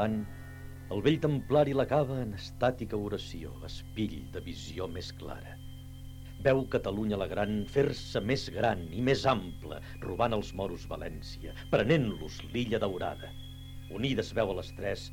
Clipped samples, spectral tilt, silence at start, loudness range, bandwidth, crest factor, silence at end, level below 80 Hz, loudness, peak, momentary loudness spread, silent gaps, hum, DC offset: under 0.1%; -6.5 dB/octave; 0 s; 6 LU; 18.5 kHz; 20 dB; 0 s; -48 dBFS; -32 LUFS; -12 dBFS; 16 LU; none; none; under 0.1%